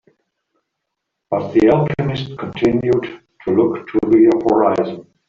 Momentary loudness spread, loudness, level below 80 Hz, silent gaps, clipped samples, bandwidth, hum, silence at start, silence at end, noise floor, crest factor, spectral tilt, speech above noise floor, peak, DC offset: 13 LU; -16 LUFS; -48 dBFS; none; under 0.1%; 7 kHz; none; 1.3 s; 0.25 s; -77 dBFS; 14 dB; -8.5 dB/octave; 62 dB; -2 dBFS; under 0.1%